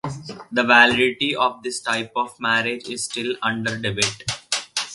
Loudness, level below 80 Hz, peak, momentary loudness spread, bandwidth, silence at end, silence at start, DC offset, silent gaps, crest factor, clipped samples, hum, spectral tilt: -20 LUFS; -56 dBFS; 0 dBFS; 13 LU; 11.5 kHz; 0 s; 0.05 s; under 0.1%; none; 22 dB; under 0.1%; none; -2.5 dB/octave